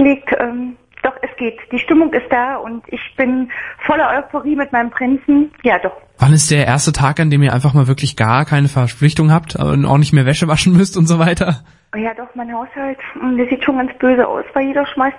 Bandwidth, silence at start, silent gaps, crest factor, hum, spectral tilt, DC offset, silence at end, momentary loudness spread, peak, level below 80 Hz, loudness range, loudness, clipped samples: 11.5 kHz; 0 s; none; 14 dB; none; -6 dB/octave; under 0.1%; 0 s; 12 LU; 0 dBFS; -40 dBFS; 5 LU; -14 LUFS; under 0.1%